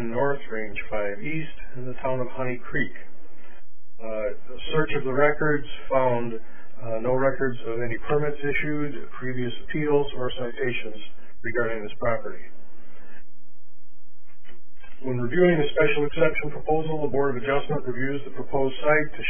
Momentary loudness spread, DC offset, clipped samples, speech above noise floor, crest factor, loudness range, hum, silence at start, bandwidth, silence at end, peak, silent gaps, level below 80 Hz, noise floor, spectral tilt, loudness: 13 LU; 8%; under 0.1%; 35 dB; 20 dB; 9 LU; none; 0 s; 3.5 kHz; 0 s; -6 dBFS; none; -44 dBFS; -61 dBFS; -10 dB/octave; -26 LUFS